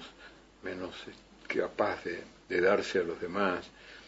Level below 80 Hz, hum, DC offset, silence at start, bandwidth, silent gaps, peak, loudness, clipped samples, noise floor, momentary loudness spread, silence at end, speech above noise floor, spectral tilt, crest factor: -64 dBFS; none; under 0.1%; 0 s; 8 kHz; none; -16 dBFS; -33 LUFS; under 0.1%; -55 dBFS; 22 LU; 0 s; 22 dB; -5 dB/octave; 18 dB